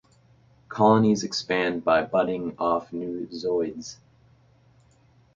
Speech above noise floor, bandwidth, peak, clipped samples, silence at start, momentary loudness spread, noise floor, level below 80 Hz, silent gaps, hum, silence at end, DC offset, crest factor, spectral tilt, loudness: 35 dB; 7.6 kHz; -4 dBFS; under 0.1%; 0.7 s; 13 LU; -59 dBFS; -60 dBFS; none; none; 1.4 s; under 0.1%; 22 dB; -5.5 dB/octave; -24 LUFS